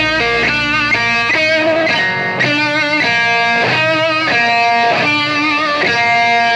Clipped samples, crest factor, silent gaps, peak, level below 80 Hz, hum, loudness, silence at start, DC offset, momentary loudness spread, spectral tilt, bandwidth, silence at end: under 0.1%; 10 dB; none; -4 dBFS; -44 dBFS; none; -12 LUFS; 0 s; under 0.1%; 2 LU; -3.5 dB/octave; 10.5 kHz; 0 s